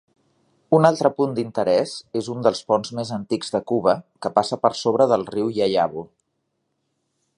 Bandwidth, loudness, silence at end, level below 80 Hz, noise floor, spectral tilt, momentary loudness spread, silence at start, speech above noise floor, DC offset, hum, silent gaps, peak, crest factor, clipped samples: 11.5 kHz; -21 LUFS; 1.3 s; -62 dBFS; -74 dBFS; -6 dB/octave; 9 LU; 0.7 s; 54 dB; under 0.1%; none; none; -2 dBFS; 20 dB; under 0.1%